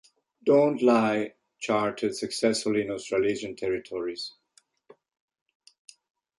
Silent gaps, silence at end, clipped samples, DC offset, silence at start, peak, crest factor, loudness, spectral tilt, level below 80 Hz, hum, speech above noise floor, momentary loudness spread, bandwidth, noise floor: none; 2.1 s; under 0.1%; under 0.1%; 0.45 s; -10 dBFS; 18 dB; -26 LUFS; -4.5 dB/octave; -66 dBFS; none; 40 dB; 12 LU; 11.5 kHz; -66 dBFS